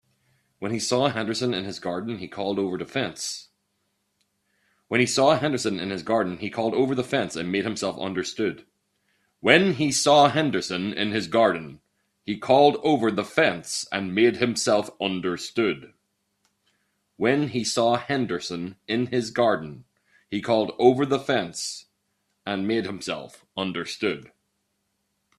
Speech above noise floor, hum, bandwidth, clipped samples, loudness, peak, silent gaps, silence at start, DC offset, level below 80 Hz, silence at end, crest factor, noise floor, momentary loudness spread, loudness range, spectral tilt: 51 dB; none; 13 kHz; under 0.1%; -24 LUFS; 0 dBFS; none; 0.6 s; under 0.1%; -66 dBFS; 1.1 s; 24 dB; -75 dBFS; 13 LU; 7 LU; -4 dB/octave